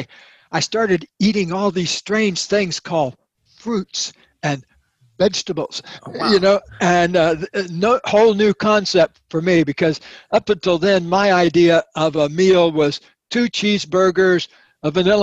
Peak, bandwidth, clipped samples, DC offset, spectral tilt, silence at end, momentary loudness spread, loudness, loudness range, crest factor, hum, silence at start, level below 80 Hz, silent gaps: -2 dBFS; 9.2 kHz; under 0.1%; under 0.1%; -5 dB/octave; 0 s; 11 LU; -17 LUFS; 6 LU; 16 dB; none; 0 s; -52 dBFS; none